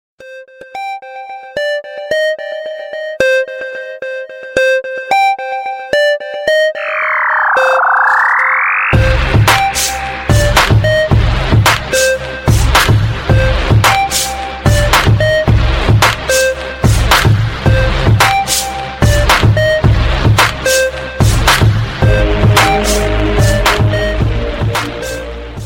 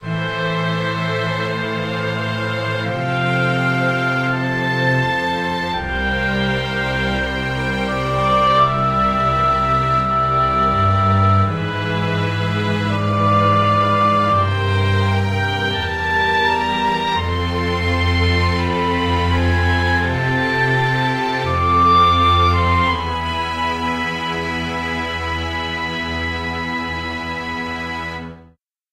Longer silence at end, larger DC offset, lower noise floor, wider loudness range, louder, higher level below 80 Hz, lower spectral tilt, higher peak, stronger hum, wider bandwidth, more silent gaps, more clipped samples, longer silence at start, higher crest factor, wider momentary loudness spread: second, 0 s vs 0.5 s; neither; second, -33 dBFS vs -51 dBFS; about the same, 5 LU vs 6 LU; first, -11 LUFS vs -18 LUFS; first, -20 dBFS vs -34 dBFS; second, -4.5 dB/octave vs -6 dB/octave; first, 0 dBFS vs -4 dBFS; neither; first, 17 kHz vs 13 kHz; neither; neither; first, 0.2 s vs 0 s; about the same, 12 dB vs 14 dB; first, 11 LU vs 7 LU